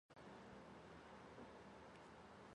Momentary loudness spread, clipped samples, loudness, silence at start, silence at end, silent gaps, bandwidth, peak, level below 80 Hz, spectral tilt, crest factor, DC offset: 2 LU; under 0.1%; -61 LUFS; 0.1 s; 0 s; none; 10.5 kHz; -46 dBFS; -78 dBFS; -5.5 dB/octave; 16 dB; under 0.1%